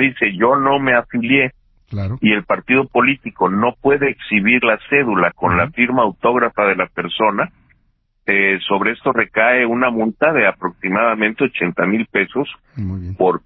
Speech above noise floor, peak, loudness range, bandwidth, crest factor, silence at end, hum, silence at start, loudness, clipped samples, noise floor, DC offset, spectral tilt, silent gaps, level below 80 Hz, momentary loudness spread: 45 dB; 0 dBFS; 2 LU; 4.6 kHz; 16 dB; 0.05 s; none; 0 s; -16 LUFS; under 0.1%; -61 dBFS; under 0.1%; -9.5 dB/octave; none; -44 dBFS; 8 LU